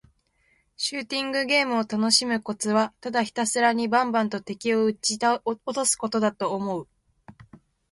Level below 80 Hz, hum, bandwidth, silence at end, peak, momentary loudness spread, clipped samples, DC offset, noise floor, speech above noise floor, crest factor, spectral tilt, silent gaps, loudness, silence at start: -68 dBFS; none; 11.5 kHz; 0.6 s; -6 dBFS; 8 LU; under 0.1%; under 0.1%; -67 dBFS; 42 dB; 20 dB; -2.5 dB/octave; none; -24 LUFS; 0.8 s